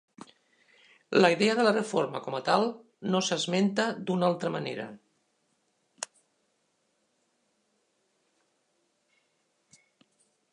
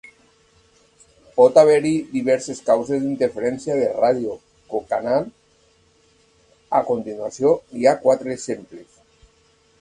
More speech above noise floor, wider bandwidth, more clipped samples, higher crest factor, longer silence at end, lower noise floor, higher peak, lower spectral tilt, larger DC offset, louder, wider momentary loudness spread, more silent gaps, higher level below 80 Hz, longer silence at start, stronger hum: first, 48 dB vs 40 dB; about the same, 11 kHz vs 11 kHz; neither; about the same, 24 dB vs 20 dB; first, 4.5 s vs 1 s; first, -75 dBFS vs -58 dBFS; second, -8 dBFS vs 0 dBFS; about the same, -4.5 dB/octave vs -5.5 dB/octave; neither; second, -27 LUFS vs -20 LUFS; about the same, 17 LU vs 15 LU; neither; second, -82 dBFS vs -60 dBFS; second, 1.1 s vs 1.35 s; neither